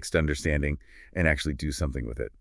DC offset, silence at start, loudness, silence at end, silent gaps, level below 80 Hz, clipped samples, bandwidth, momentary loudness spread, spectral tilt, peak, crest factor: under 0.1%; 0 s; -29 LUFS; 0.1 s; none; -36 dBFS; under 0.1%; 12 kHz; 10 LU; -5.5 dB/octave; -8 dBFS; 20 dB